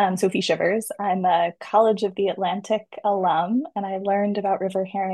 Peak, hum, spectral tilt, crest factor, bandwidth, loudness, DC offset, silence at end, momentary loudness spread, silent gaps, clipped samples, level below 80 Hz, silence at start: -6 dBFS; none; -5.5 dB/octave; 16 dB; 12.5 kHz; -23 LUFS; under 0.1%; 0 s; 6 LU; none; under 0.1%; -72 dBFS; 0 s